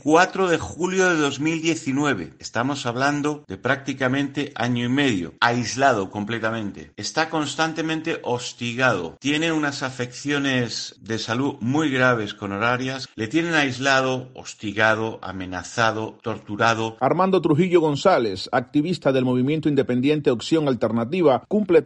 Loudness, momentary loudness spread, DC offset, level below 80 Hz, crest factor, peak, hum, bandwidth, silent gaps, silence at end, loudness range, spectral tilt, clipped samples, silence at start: -22 LUFS; 10 LU; under 0.1%; -58 dBFS; 20 dB; -2 dBFS; none; 9.6 kHz; none; 0 s; 3 LU; -5 dB/octave; under 0.1%; 0.05 s